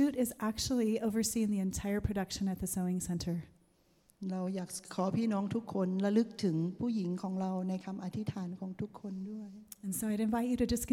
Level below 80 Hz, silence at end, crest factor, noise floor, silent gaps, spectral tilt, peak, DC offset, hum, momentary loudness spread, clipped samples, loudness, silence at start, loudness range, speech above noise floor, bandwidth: -56 dBFS; 0 s; 16 dB; -69 dBFS; none; -5.5 dB/octave; -18 dBFS; under 0.1%; none; 10 LU; under 0.1%; -35 LUFS; 0 s; 4 LU; 35 dB; 17 kHz